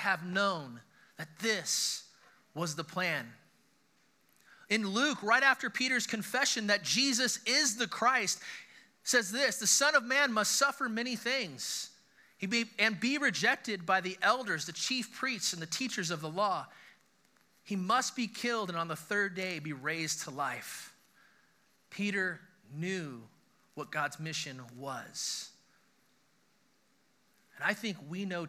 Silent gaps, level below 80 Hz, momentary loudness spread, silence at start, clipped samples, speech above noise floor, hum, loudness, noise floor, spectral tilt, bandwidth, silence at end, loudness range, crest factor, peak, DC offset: none; under -90 dBFS; 15 LU; 0 s; under 0.1%; 39 dB; none; -32 LUFS; -72 dBFS; -2 dB/octave; 15.5 kHz; 0 s; 11 LU; 22 dB; -12 dBFS; under 0.1%